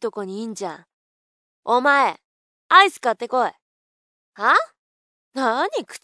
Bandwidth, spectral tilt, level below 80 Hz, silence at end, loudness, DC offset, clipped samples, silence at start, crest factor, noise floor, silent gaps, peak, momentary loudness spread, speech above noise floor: 11 kHz; -2.5 dB/octave; under -90 dBFS; 0.05 s; -19 LUFS; under 0.1%; under 0.1%; 0 s; 22 dB; under -90 dBFS; 0.93-1.63 s, 2.25-2.70 s, 3.62-4.33 s, 4.79-5.32 s; 0 dBFS; 18 LU; over 70 dB